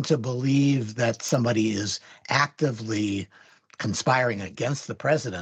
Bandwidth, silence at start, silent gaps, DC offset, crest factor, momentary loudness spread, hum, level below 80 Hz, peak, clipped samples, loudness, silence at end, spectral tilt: 11 kHz; 0 s; none; under 0.1%; 20 dB; 8 LU; none; -70 dBFS; -6 dBFS; under 0.1%; -25 LUFS; 0 s; -5 dB/octave